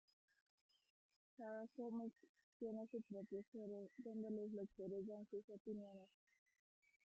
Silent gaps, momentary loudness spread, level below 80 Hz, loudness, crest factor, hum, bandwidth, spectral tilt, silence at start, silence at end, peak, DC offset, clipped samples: 2.29-2.35 s, 2.43-2.60 s, 3.47-3.52 s, 5.44-5.48 s, 5.60-5.65 s; 5 LU; under -90 dBFS; -53 LUFS; 14 dB; none; 7.6 kHz; -8.5 dB/octave; 1.4 s; 0.95 s; -40 dBFS; under 0.1%; under 0.1%